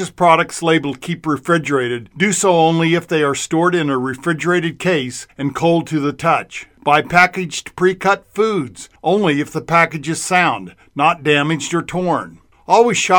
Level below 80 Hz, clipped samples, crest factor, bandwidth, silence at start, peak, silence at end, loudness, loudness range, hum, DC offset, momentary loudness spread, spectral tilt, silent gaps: -54 dBFS; under 0.1%; 16 dB; 18 kHz; 0 s; 0 dBFS; 0 s; -16 LUFS; 2 LU; none; under 0.1%; 10 LU; -4.5 dB/octave; none